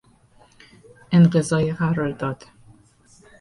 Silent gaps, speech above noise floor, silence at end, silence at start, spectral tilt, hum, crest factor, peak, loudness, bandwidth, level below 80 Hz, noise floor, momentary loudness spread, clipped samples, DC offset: none; 36 dB; 1.05 s; 1.1 s; -7 dB/octave; none; 18 dB; -6 dBFS; -20 LUFS; 11 kHz; -54 dBFS; -55 dBFS; 13 LU; under 0.1%; under 0.1%